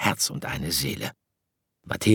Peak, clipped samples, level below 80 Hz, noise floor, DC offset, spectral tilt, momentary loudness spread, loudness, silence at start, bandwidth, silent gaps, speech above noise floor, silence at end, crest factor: -4 dBFS; under 0.1%; -50 dBFS; -81 dBFS; under 0.1%; -3.5 dB/octave; 10 LU; -27 LUFS; 0 s; 19 kHz; none; 55 dB; 0 s; 22 dB